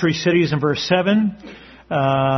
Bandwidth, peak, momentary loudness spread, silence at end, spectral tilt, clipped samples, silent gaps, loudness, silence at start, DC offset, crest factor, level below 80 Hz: 6.4 kHz; -2 dBFS; 11 LU; 0 s; -6 dB/octave; under 0.1%; none; -18 LUFS; 0 s; under 0.1%; 16 dB; -52 dBFS